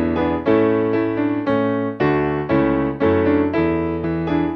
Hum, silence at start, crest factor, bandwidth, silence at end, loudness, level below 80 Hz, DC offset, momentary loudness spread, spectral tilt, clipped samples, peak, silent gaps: none; 0 s; 14 dB; 5.8 kHz; 0 s; -19 LUFS; -40 dBFS; under 0.1%; 4 LU; -10 dB/octave; under 0.1%; -4 dBFS; none